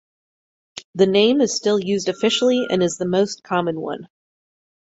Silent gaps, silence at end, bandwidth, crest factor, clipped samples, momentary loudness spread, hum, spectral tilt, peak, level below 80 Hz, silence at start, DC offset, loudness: 0.84-0.93 s; 0.9 s; 8.2 kHz; 18 dB; under 0.1%; 16 LU; none; -4.5 dB/octave; -4 dBFS; -64 dBFS; 0.75 s; under 0.1%; -19 LUFS